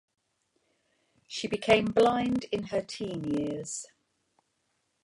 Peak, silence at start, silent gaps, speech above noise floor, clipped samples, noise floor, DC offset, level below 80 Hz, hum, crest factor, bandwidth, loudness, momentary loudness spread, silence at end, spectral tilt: -8 dBFS; 1.3 s; none; 48 dB; under 0.1%; -77 dBFS; under 0.1%; -62 dBFS; none; 22 dB; 11.5 kHz; -29 LUFS; 14 LU; 1.2 s; -4.5 dB/octave